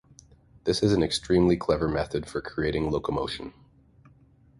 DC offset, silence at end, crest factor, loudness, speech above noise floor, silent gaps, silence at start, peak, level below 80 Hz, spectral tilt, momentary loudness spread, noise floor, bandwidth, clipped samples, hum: under 0.1%; 1.1 s; 18 dB; -26 LUFS; 32 dB; none; 0.65 s; -10 dBFS; -44 dBFS; -6 dB/octave; 11 LU; -58 dBFS; 11.5 kHz; under 0.1%; none